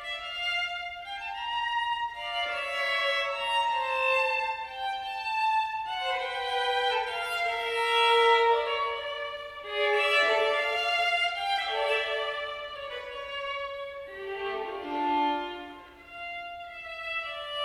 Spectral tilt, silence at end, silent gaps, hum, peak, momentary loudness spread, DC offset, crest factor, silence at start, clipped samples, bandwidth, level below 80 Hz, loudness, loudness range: -1.5 dB/octave; 0 s; none; none; -10 dBFS; 14 LU; under 0.1%; 18 dB; 0 s; under 0.1%; 16 kHz; -64 dBFS; -28 LUFS; 8 LU